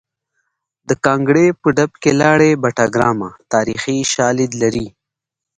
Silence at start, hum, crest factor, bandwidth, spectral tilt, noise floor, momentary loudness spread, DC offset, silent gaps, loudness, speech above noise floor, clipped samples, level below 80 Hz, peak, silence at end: 0.9 s; none; 16 dB; 9.6 kHz; -5 dB/octave; -83 dBFS; 7 LU; under 0.1%; none; -15 LUFS; 69 dB; under 0.1%; -48 dBFS; 0 dBFS; 0.7 s